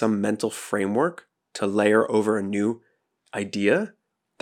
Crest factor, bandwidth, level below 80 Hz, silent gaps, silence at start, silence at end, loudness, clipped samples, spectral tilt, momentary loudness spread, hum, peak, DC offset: 18 dB; 15 kHz; -82 dBFS; none; 0 s; 0.5 s; -24 LUFS; under 0.1%; -5.5 dB/octave; 14 LU; none; -6 dBFS; under 0.1%